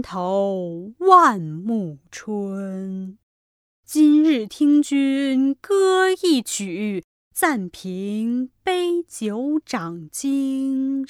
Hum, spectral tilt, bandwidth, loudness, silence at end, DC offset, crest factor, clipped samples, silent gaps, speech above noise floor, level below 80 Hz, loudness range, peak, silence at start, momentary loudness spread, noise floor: none; -5 dB/octave; 15 kHz; -21 LUFS; 0.05 s; under 0.1%; 20 dB; under 0.1%; 3.23-3.83 s, 7.04-7.31 s; over 70 dB; -64 dBFS; 6 LU; 0 dBFS; 0 s; 15 LU; under -90 dBFS